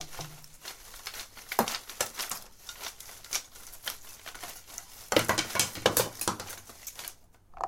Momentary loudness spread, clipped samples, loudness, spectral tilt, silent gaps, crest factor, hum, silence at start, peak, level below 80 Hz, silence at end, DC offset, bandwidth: 17 LU; under 0.1%; -32 LUFS; -2 dB/octave; none; 32 dB; none; 0 s; -4 dBFS; -58 dBFS; 0 s; under 0.1%; 17 kHz